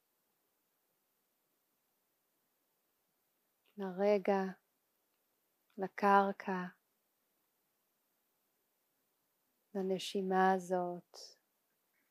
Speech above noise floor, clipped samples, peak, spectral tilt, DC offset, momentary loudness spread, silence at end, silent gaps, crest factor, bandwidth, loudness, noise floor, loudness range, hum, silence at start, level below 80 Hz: 47 dB; under 0.1%; -14 dBFS; -6 dB/octave; under 0.1%; 16 LU; 0.8 s; none; 26 dB; 15.5 kHz; -35 LUFS; -82 dBFS; 12 LU; none; 3.75 s; under -90 dBFS